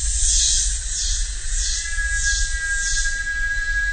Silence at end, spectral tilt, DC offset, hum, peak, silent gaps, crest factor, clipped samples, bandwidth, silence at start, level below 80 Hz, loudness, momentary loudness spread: 0 s; 1.5 dB/octave; 0.4%; none; -4 dBFS; none; 16 dB; under 0.1%; 9.4 kHz; 0 s; -26 dBFS; -20 LUFS; 7 LU